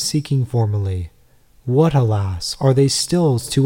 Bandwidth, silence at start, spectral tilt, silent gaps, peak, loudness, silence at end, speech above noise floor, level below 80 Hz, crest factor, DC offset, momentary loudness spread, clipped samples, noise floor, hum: 17 kHz; 0 s; -6 dB/octave; none; -2 dBFS; -18 LUFS; 0 s; 36 dB; -44 dBFS; 16 dB; 0.2%; 10 LU; under 0.1%; -53 dBFS; none